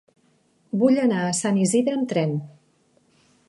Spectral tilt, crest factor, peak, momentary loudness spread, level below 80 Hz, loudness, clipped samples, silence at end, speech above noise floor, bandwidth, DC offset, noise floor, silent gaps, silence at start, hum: -5.5 dB/octave; 18 dB; -6 dBFS; 8 LU; -72 dBFS; -22 LUFS; under 0.1%; 1 s; 42 dB; 11.5 kHz; under 0.1%; -63 dBFS; none; 0.75 s; none